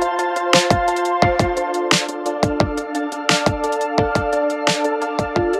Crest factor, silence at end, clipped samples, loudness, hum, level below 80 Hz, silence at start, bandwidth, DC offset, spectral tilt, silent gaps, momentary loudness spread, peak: 18 dB; 0 s; under 0.1%; -19 LUFS; none; -38 dBFS; 0 s; 15.5 kHz; under 0.1%; -4 dB/octave; none; 5 LU; 0 dBFS